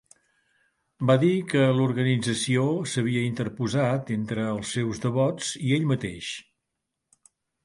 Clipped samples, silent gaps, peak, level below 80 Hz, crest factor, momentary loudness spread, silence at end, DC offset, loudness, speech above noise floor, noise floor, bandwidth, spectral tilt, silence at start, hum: under 0.1%; none; -8 dBFS; -60 dBFS; 18 dB; 8 LU; 1.25 s; under 0.1%; -25 LUFS; 58 dB; -82 dBFS; 11.5 kHz; -6 dB/octave; 1 s; none